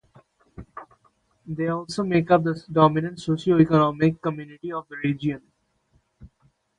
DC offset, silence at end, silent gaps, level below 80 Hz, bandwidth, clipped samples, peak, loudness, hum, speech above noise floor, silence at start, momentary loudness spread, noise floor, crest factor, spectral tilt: under 0.1%; 0.55 s; none; -56 dBFS; 10.5 kHz; under 0.1%; -2 dBFS; -23 LUFS; none; 44 dB; 0.6 s; 18 LU; -66 dBFS; 22 dB; -7.5 dB/octave